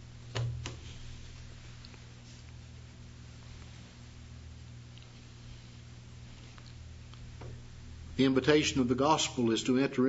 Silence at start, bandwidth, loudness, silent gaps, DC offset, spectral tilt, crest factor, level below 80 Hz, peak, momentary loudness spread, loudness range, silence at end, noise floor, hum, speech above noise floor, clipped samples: 0 s; 8 kHz; -30 LUFS; none; under 0.1%; -5 dB/octave; 26 dB; -52 dBFS; -10 dBFS; 23 LU; 20 LU; 0 s; -50 dBFS; 60 Hz at -55 dBFS; 23 dB; under 0.1%